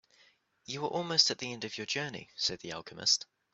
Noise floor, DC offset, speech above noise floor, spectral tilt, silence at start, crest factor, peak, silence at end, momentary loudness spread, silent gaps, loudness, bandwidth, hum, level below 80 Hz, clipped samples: -67 dBFS; under 0.1%; 33 dB; -1.5 dB/octave; 0.7 s; 26 dB; -10 dBFS; 0.3 s; 14 LU; none; -31 LUFS; 8.2 kHz; none; -72 dBFS; under 0.1%